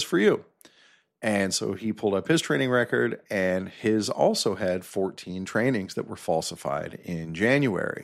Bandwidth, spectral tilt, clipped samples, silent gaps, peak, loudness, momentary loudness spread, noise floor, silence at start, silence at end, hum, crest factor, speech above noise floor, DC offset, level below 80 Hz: 15 kHz; -4.5 dB/octave; under 0.1%; none; -8 dBFS; -26 LUFS; 9 LU; -60 dBFS; 0 s; 0 s; none; 18 dB; 35 dB; under 0.1%; -64 dBFS